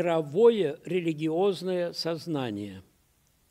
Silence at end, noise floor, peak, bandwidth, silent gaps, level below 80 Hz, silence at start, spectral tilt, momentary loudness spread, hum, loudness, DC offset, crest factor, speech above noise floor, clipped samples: 0.7 s; -67 dBFS; -10 dBFS; 13.5 kHz; none; -72 dBFS; 0 s; -6.5 dB/octave; 11 LU; none; -27 LUFS; under 0.1%; 18 dB; 40 dB; under 0.1%